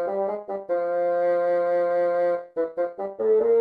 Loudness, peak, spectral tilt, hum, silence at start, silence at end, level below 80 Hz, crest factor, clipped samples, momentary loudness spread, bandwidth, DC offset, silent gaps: -24 LUFS; -14 dBFS; -8 dB/octave; none; 0 s; 0 s; -74 dBFS; 10 dB; under 0.1%; 7 LU; 4.8 kHz; under 0.1%; none